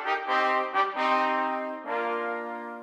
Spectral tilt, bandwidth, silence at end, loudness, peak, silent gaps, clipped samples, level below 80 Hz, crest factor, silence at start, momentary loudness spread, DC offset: -3 dB/octave; 12 kHz; 0 s; -27 LUFS; -12 dBFS; none; under 0.1%; -84 dBFS; 16 dB; 0 s; 8 LU; under 0.1%